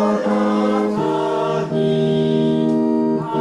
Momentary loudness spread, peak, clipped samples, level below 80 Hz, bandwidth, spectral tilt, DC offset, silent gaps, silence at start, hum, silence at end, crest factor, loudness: 2 LU; -6 dBFS; under 0.1%; -56 dBFS; 10.5 kHz; -7.5 dB/octave; under 0.1%; none; 0 s; none; 0 s; 10 dB; -18 LUFS